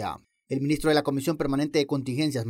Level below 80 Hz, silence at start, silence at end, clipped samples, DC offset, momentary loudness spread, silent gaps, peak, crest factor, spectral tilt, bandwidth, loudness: -50 dBFS; 0 s; 0 s; under 0.1%; under 0.1%; 10 LU; none; -10 dBFS; 16 dB; -6 dB/octave; 16 kHz; -26 LUFS